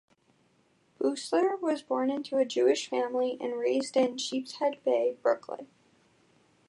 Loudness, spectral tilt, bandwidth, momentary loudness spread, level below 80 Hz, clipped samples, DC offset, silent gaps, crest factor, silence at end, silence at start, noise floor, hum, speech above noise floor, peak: -29 LUFS; -3 dB/octave; 11.5 kHz; 6 LU; -86 dBFS; under 0.1%; under 0.1%; none; 18 dB; 1.05 s; 1 s; -68 dBFS; none; 39 dB; -12 dBFS